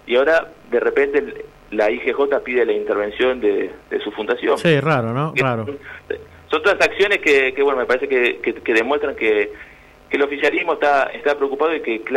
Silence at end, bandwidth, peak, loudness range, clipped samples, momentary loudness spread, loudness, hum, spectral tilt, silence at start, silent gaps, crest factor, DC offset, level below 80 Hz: 0 s; 12 kHz; -6 dBFS; 3 LU; under 0.1%; 10 LU; -18 LUFS; none; -5.5 dB/octave; 0.05 s; none; 14 dB; under 0.1%; -52 dBFS